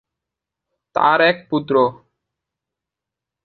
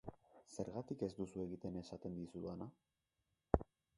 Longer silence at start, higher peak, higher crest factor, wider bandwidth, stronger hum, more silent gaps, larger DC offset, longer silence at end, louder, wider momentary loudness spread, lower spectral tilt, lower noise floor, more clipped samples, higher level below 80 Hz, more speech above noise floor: first, 0.95 s vs 0.05 s; first, -2 dBFS vs -12 dBFS; second, 20 dB vs 34 dB; second, 6.2 kHz vs 11.5 kHz; neither; neither; neither; first, 1.5 s vs 0.35 s; first, -17 LUFS vs -46 LUFS; second, 9 LU vs 12 LU; about the same, -7.5 dB/octave vs -7.5 dB/octave; about the same, -85 dBFS vs -88 dBFS; neither; second, -64 dBFS vs -56 dBFS; first, 69 dB vs 41 dB